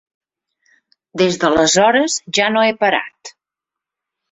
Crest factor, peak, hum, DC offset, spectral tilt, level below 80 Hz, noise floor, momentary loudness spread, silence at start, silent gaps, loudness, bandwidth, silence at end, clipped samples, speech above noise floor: 16 dB; -2 dBFS; none; under 0.1%; -3 dB/octave; -54 dBFS; -85 dBFS; 8 LU; 1.15 s; none; -15 LUFS; 8.4 kHz; 1 s; under 0.1%; 70 dB